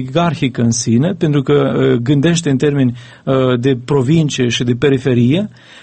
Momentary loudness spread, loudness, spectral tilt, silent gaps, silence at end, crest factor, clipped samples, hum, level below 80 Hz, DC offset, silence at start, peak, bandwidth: 3 LU; -14 LUFS; -6 dB/octave; none; 0.35 s; 14 dB; under 0.1%; none; -46 dBFS; under 0.1%; 0 s; 0 dBFS; 8.8 kHz